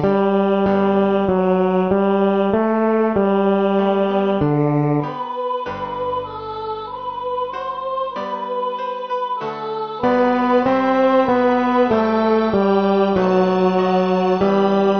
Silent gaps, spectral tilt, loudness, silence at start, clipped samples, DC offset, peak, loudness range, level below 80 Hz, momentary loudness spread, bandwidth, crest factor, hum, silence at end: none; -8.5 dB/octave; -18 LUFS; 0 s; under 0.1%; under 0.1%; -4 dBFS; 8 LU; -50 dBFS; 9 LU; 6.4 kHz; 14 dB; none; 0 s